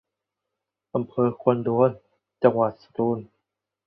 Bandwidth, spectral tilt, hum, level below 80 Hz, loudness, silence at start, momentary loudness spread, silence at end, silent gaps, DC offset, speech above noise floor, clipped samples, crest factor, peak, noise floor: 5.2 kHz; -11.5 dB/octave; none; -66 dBFS; -24 LUFS; 0.95 s; 9 LU; 0.6 s; none; under 0.1%; 62 dB; under 0.1%; 22 dB; -4 dBFS; -84 dBFS